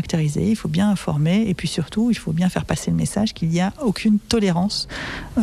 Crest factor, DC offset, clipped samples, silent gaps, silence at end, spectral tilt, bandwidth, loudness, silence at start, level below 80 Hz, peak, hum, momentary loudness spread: 14 dB; under 0.1%; under 0.1%; none; 0 s; -6 dB/octave; 14 kHz; -21 LUFS; 0 s; -42 dBFS; -6 dBFS; none; 5 LU